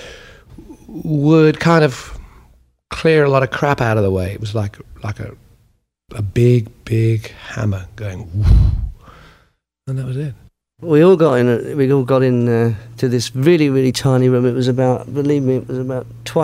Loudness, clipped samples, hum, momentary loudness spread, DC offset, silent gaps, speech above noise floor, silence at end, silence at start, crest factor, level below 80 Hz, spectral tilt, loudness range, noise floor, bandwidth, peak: -16 LUFS; under 0.1%; none; 16 LU; under 0.1%; none; 44 dB; 0 s; 0 s; 16 dB; -28 dBFS; -7 dB/octave; 5 LU; -59 dBFS; 15 kHz; 0 dBFS